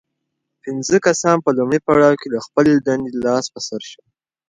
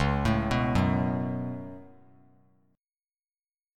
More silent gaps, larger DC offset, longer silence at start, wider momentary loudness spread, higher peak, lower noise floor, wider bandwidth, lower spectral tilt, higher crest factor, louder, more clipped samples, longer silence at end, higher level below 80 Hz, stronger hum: neither; neither; first, 0.65 s vs 0 s; about the same, 14 LU vs 16 LU; first, 0 dBFS vs -12 dBFS; second, -76 dBFS vs under -90 dBFS; second, 9.6 kHz vs 13 kHz; second, -5 dB/octave vs -7.5 dB/octave; about the same, 18 dB vs 18 dB; first, -17 LUFS vs -28 LUFS; neither; second, 0.55 s vs 1.9 s; second, -54 dBFS vs -42 dBFS; neither